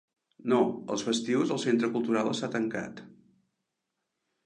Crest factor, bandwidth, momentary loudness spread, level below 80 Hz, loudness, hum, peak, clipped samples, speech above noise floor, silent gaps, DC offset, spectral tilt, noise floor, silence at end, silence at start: 18 dB; 10.5 kHz; 11 LU; -74 dBFS; -29 LUFS; none; -12 dBFS; under 0.1%; 55 dB; none; under 0.1%; -5 dB/octave; -84 dBFS; 1.35 s; 0.45 s